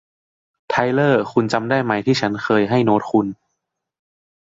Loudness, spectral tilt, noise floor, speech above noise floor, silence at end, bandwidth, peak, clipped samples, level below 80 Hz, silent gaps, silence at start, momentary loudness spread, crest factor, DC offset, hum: -18 LUFS; -6.5 dB/octave; -77 dBFS; 60 dB; 1.15 s; 7.8 kHz; -2 dBFS; under 0.1%; -58 dBFS; none; 0.7 s; 4 LU; 16 dB; under 0.1%; none